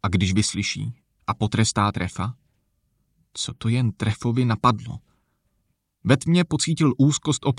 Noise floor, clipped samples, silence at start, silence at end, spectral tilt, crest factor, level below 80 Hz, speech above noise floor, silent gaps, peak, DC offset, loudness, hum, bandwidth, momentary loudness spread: -72 dBFS; under 0.1%; 0.05 s; 0 s; -5 dB/octave; 20 dB; -50 dBFS; 50 dB; none; -2 dBFS; under 0.1%; -23 LUFS; none; 11.5 kHz; 12 LU